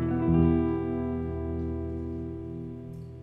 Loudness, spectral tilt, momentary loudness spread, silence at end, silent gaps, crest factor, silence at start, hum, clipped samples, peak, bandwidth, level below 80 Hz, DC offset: -29 LUFS; -11.5 dB/octave; 16 LU; 0 s; none; 18 dB; 0 s; none; under 0.1%; -12 dBFS; 3.9 kHz; -40 dBFS; under 0.1%